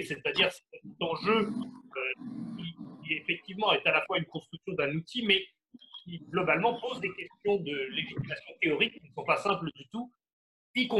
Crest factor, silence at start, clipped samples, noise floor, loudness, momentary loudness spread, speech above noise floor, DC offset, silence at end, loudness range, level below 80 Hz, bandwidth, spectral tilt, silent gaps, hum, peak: 22 dB; 0 s; under 0.1%; -52 dBFS; -31 LUFS; 15 LU; 21 dB; under 0.1%; 0 s; 2 LU; -70 dBFS; 12.5 kHz; -5 dB/octave; 10.33-10.74 s; none; -10 dBFS